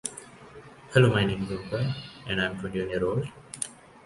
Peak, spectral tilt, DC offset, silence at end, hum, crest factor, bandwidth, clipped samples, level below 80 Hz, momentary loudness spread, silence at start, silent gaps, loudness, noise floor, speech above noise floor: -4 dBFS; -5.5 dB/octave; under 0.1%; 0.3 s; none; 24 dB; 11.5 kHz; under 0.1%; -52 dBFS; 23 LU; 0.05 s; none; -28 LUFS; -48 dBFS; 21 dB